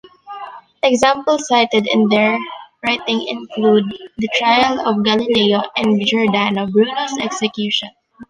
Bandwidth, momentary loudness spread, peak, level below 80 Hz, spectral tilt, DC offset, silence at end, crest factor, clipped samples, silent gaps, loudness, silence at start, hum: 11 kHz; 11 LU; -2 dBFS; -56 dBFS; -4.5 dB/octave; under 0.1%; 0.05 s; 16 dB; under 0.1%; none; -16 LUFS; 0.25 s; none